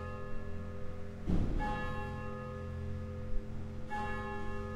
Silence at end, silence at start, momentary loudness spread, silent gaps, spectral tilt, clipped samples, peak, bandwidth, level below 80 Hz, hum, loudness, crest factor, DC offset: 0 s; 0 s; 8 LU; none; -7.5 dB/octave; under 0.1%; -18 dBFS; 9 kHz; -42 dBFS; none; -41 LUFS; 18 dB; under 0.1%